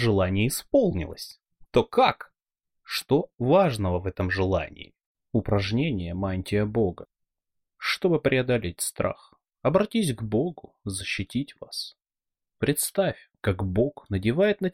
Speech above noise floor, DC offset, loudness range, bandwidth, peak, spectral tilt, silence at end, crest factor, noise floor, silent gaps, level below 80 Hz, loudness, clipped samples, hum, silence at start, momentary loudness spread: 63 dB; under 0.1%; 4 LU; 16 kHz; -6 dBFS; -5.5 dB/octave; 0.05 s; 20 dB; -88 dBFS; 5.06-5.15 s; -48 dBFS; -26 LUFS; under 0.1%; none; 0 s; 12 LU